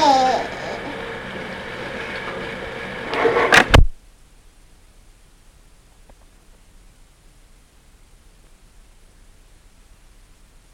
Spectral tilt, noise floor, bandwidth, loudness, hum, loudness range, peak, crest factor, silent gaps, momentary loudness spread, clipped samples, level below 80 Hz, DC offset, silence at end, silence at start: -4.5 dB/octave; -50 dBFS; 18 kHz; -20 LUFS; none; 6 LU; 0 dBFS; 22 dB; none; 17 LU; under 0.1%; -30 dBFS; under 0.1%; 6.8 s; 0 s